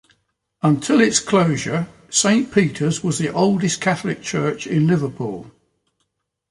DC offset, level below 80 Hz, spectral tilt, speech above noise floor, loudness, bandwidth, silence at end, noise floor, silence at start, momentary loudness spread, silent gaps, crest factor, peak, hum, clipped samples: under 0.1%; -56 dBFS; -4.5 dB/octave; 55 dB; -19 LUFS; 11.5 kHz; 1 s; -73 dBFS; 0.65 s; 9 LU; none; 18 dB; -2 dBFS; none; under 0.1%